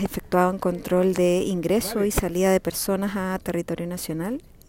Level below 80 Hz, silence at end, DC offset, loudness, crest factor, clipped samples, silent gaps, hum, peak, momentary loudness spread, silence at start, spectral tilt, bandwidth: -42 dBFS; 0.3 s; under 0.1%; -24 LUFS; 16 dB; under 0.1%; none; none; -6 dBFS; 8 LU; 0 s; -5.5 dB/octave; 16.5 kHz